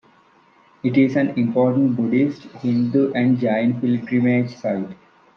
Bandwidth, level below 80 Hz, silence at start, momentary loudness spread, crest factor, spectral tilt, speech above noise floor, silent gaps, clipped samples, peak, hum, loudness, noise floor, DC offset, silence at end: 6.4 kHz; -66 dBFS; 0.85 s; 8 LU; 16 dB; -9 dB/octave; 36 dB; none; under 0.1%; -4 dBFS; none; -20 LUFS; -54 dBFS; under 0.1%; 0.45 s